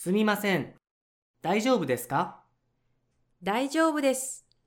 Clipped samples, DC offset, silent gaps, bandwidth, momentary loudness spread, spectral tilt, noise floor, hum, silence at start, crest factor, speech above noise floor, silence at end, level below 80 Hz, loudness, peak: under 0.1%; under 0.1%; 0.91-1.34 s; 18 kHz; 11 LU; -4.5 dB/octave; -73 dBFS; none; 0 s; 18 dB; 46 dB; 0.25 s; -72 dBFS; -28 LUFS; -12 dBFS